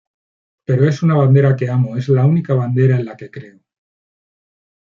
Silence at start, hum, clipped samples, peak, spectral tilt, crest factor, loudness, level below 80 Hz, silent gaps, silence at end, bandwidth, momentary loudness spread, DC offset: 0.7 s; none; under 0.1%; -2 dBFS; -9.5 dB/octave; 14 dB; -15 LUFS; -58 dBFS; none; 1.35 s; 7 kHz; 20 LU; under 0.1%